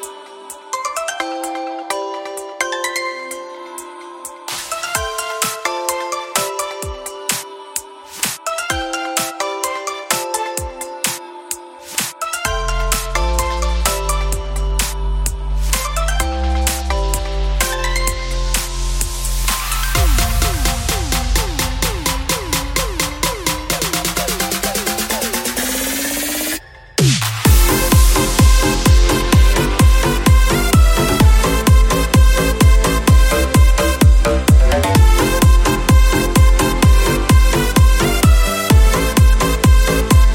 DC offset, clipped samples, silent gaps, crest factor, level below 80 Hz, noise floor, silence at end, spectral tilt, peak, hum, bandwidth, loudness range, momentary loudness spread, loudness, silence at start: under 0.1%; under 0.1%; none; 14 dB; -16 dBFS; -35 dBFS; 0 s; -4 dB/octave; 0 dBFS; none; 17 kHz; 9 LU; 11 LU; -16 LUFS; 0 s